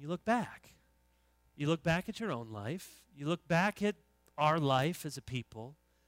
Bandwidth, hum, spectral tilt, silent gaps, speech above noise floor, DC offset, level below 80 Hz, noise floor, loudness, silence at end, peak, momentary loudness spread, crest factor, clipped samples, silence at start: 16 kHz; none; -6 dB/octave; none; 37 dB; under 0.1%; -64 dBFS; -71 dBFS; -35 LUFS; 0.35 s; -16 dBFS; 18 LU; 20 dB; under 0.1%; 0 s